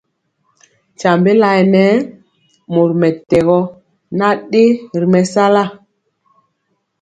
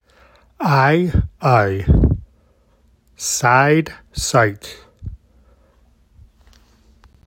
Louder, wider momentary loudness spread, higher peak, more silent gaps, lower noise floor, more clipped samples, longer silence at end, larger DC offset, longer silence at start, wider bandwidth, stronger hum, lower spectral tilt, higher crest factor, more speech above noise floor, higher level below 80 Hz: first, -13 LUFS vs -17 LUFS; second, 8 LU vs 22 LU; about the same, 0 dBFS vs 0 dBFS; neither; first, -68 dBFS vs -56 dBFS; neither; second, 1.25 s vs 2.1 s; neither; first, 1 s vs 0.6 s; second, 9.2 kHz vs 16.5 kHz; neither; first, -7 dB/octave vs -5 dB/octave; about the same, 14 dB vs 18 dB; first, 56 dB vs 40 dB; second, -52 dBFS vs -30 dBFS